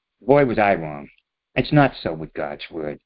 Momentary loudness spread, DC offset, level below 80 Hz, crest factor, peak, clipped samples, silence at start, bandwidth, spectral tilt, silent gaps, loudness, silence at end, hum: 13 LU; under 0.1%; -48 dBFS; 20 dB; -2 dBFS; under 0.1%; 0.25 s; 5.4 kHz; -11.5 dB/octave; none; -21 LUFS; 0.1 s; none